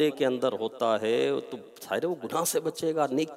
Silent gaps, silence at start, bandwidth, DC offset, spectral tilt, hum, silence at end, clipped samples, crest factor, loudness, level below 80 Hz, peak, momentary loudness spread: none; 0 s; 16 kHz; under 0.1%; -4 dB/octave; none; 0 s; under 0.1%; 16 dB; -28 LUFS; -80 dBFS; -12 dBFS; 8 LU